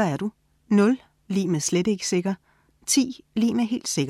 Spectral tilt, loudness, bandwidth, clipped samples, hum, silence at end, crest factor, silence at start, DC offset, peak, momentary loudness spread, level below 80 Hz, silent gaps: -4.5 dB/octave; -24 LUFS; 15 kHz; under 0.1%; none; 0 s; 16 dB; 0 s; under 0.1%; -8 dBFS; 10 LU; -64 dBFS; none